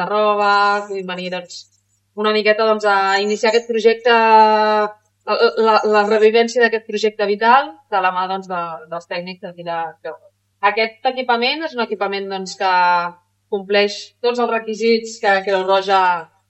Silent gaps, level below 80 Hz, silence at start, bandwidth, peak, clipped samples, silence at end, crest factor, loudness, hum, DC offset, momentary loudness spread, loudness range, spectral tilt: none; -72 dBFS; 0 s; 8.4 kHz; 0 dBFS; under 0.1%; 0.25 s; 16 dB; -16 LUFS; none; under 0.1%; 13 LU; 7 LU; -3.5 dB/octave